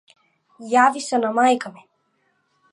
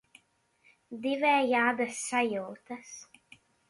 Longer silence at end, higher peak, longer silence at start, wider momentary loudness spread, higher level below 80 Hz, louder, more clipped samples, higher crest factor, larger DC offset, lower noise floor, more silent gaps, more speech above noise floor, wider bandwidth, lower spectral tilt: first, 1 s vs 0.65 s; first, -4 dBFS vs -14 dBFS; second, 0.6 s vs 0.9 s; second, 15 LU vs 21 LU; about the same, -82 dBFS vs -78 dBFS; first, -19 LUFS vs -28 LUFS; neither; about the same, 18 dB vs 18 dB; neither; about the same, -67 dBFS vs -69 dBFS; neither; first, 49 dB vs 40 dB; about the same, 11.5 kHz vs 11.5 kHz; about the same, -3 dB/octave vs -3 dB/octave